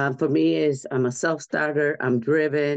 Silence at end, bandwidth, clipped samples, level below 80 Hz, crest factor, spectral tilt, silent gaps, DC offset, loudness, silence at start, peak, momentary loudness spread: 0 s; 9 kHz; under 0.1%; -70 dBFS; 12 dB; -6 dB/octave; none; under 0.1%; -23 LUFS; 0 s; -10 dBFS; 4 LU